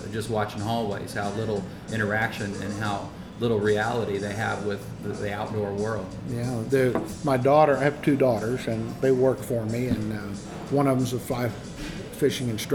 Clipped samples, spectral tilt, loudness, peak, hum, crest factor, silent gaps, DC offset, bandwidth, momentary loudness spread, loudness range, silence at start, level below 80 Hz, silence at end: under 0.1%; -6 dB/octave; -26 LUFS; -8 dBFS; none; 18 dB; none; under 0.1%; 19.5 kHz; 11 LU; 5 LU; 0 s; -50 dBFS; 0 s